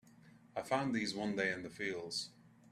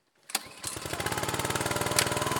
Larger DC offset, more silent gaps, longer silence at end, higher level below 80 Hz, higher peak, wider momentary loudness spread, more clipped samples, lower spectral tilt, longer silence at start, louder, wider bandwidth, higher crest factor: neither; neither; first, 0.25 s vs 0 s; second, -76 dBFS vs -54 dBFS; second, -20 dBFS vs -4 dBFS; about the same, 10 LU vs 9 LU; neither; first, -4 dB/octave vs -2.5 dB/octave; second, 0.05 s vs 0.3 s; second, -39 LUFS vs -30 LUFS; second, 15 kHz vs over 20 kHz; second, 20 dB vs 28 dB